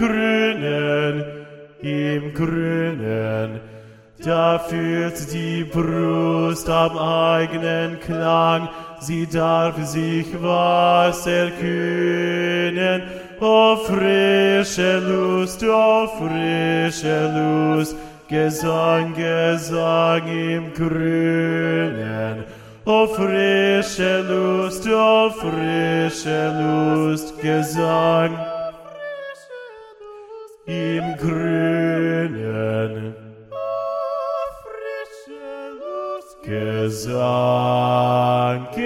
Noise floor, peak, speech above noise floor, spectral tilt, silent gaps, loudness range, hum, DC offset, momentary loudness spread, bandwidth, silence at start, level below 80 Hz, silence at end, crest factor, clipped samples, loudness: -41 dBFS; -2 dBFS; 22 dB; -5.5 dB/octave; none; 7 LU; none; under 0.1%; 15 LU; 16 kHz; 0 s; -50 dBFS; 0 s; 18 dB; under 0.1%; -20 LUFS